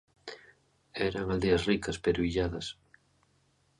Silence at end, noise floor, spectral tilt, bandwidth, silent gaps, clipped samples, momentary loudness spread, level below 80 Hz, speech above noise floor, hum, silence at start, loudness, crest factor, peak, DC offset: 1.1 s; -70 dBFS; -5.5 dB/octave; 11.5 kHz; none; under 0.1%; 19 LU; -48 dBFS; 40 dB; none; 0.25 s; -31 LUFS; 20 dB; -14 dBFS; under 0.1%